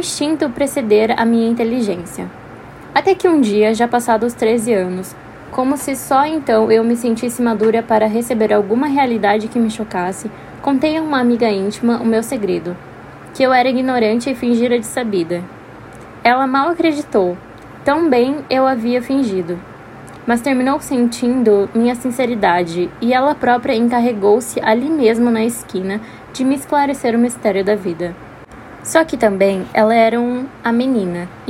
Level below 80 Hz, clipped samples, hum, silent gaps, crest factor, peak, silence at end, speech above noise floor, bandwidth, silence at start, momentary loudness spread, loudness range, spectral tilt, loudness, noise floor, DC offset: -50 dBFS; under 0.1%; none; none; 16 dB; 0 dBFS; 0 s; 21 dB; 16 kHz; 0 s; 13 LU; 2 LU; -5 dB/octave; -16 LUFS; -36 dBFS; under 0.1%